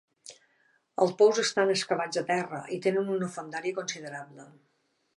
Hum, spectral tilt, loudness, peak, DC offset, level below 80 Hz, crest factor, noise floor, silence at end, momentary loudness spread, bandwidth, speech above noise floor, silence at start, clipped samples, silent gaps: none; -4 dB/octave; -28 LUFS; -10 dBFS; under 0.1%; -84 dBFS; 20 dB; -73 dBFS; 0.75 s; 20 LU; 11.5 kHz; 45 dB; 0.25 s; under 0.1%; none